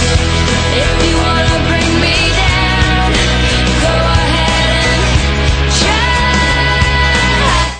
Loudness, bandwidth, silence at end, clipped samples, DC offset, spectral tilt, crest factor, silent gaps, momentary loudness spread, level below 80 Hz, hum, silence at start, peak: -11 LUFS; 10 kHz; 0 s; under 0.1%; under 0.1%; -4 dB/octave; 10 dB; none; 2 LU; -16 dBFS; none; 0 s; 0 dBFS